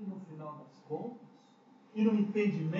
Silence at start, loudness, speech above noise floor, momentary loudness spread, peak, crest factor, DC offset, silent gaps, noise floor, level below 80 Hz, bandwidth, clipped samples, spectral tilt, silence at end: 0 s; -34 LUFS; 30 dB; 18 LU; -18 dBFS; 18 dB; under 0.1%; none; -61 dBFS; -90 dBFS; 7 kHz; under 0.1%; -7.5 dB/octave; 0 s